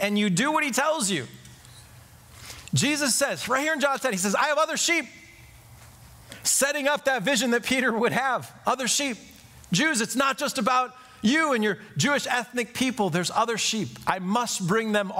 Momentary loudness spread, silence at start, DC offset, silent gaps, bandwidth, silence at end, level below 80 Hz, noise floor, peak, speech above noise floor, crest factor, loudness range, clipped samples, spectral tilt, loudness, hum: 6 LU; 0 s; under 0.1%; none; 16 kHz; 0 s; -60 dBFS; -50 dBFS; -6 dBFS; 25 dB; 20 dB; 2 LU; under 0.1%; -3 dB/octave; -24 LUFS; none